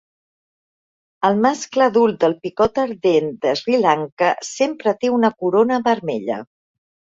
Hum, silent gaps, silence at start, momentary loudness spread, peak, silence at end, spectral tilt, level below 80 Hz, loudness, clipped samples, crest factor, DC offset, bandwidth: none; 4.12-4.17 s; 1.2 s; 5 LU; -2 dBFS; 0.75 s; -5 dB/octave; -56 dBFS; -18 LUFS; under 0.1%; 18 dB; under 0.1%; 8 kHz